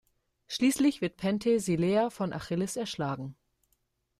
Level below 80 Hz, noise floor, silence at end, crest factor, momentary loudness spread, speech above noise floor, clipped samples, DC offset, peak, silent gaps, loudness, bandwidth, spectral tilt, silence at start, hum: -64 dBFS; -76 dBFS; 0.85 s; 16 dB; 9 LU; 47 dB; under 0.1%; under 0.1%; -14 dBFS; none; -29 LUFS; 15 kHz; -5.5 dB/octave; 0.5 s; none